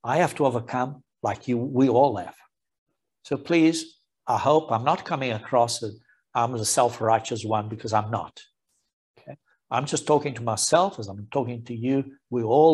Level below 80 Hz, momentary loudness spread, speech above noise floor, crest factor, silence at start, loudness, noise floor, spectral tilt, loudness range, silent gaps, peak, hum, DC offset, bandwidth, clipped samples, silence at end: -68 dBFS; 11 LU; 23 dB; 20 dB; 0.05 s; -24 LUFS; -47 dBFS; -5 dB/octave; 3 LU; 2.78-2.86 s, 8.93-9.14 s; -4 dBFS; none; under 0.1%; 13 kHz; under 0.1%; 0 s